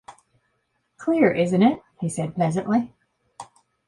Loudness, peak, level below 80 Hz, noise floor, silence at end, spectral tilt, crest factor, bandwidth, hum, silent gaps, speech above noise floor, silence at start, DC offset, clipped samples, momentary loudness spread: -22 LUFS; -6 dBFS; -62 dBFS; -72 dBFS; 0.45 s; -7 dB/octave; 20 dB; 11.5 kHz; none; none; 51 dB; 0.1 s; under 0.1%; under 0.1%; 22 LU